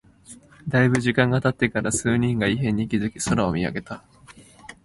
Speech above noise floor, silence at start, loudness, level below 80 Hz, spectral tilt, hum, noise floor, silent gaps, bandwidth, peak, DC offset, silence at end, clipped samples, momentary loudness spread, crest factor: 26 dB; 0.3 s; -22 LUFS; -48 dBFS; -5.5 dB/octave; none; -48 dBFS; none; 11.5 kHz; -4 dBFS; under 0.1%; 0.1 s; under 0.1%; 11 LU; 20 dB